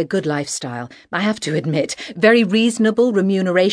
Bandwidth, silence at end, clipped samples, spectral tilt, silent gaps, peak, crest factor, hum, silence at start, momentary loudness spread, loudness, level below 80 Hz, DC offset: 11 kHz; 0 s; under 0.1%; -5 dB/octave; none; 0 dBFS; 18 dB; none; 0 s; 11 LU; -18 LUFS; -62 dBFS; under 0.1%